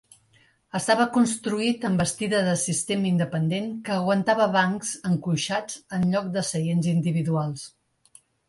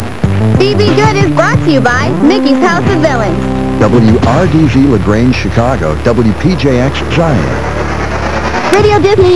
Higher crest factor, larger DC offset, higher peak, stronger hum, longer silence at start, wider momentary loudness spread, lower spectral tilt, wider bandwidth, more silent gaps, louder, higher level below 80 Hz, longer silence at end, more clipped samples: first, 18 dB vs 10 dB; second, under 0.1% vs 7%; second, -8 dBFS vs 0 dBFS; neither; first, 0.75 s vs 0 s; about the same, 8 LU vs 6 LU; second, -5 dB/octave vs -6.5 dB/octave; about the same, 11.5 kHz vs 11 kHz; neither; second, -24 LUFS vs -9 LUFS; second, -62 dBFS vs -24 dBFS; first, 0.8 s vs 0 s; second, under 0.1% vs 0.8%